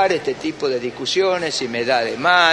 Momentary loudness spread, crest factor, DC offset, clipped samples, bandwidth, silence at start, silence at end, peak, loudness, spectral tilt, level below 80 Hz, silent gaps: 7 LU; 18 dB; under 0.1%; under 0.1%; 11 kHz; 0 s; 0 s; 0 dBFS; -19 LUFS; -3 dB/octave; -58 dBFS; none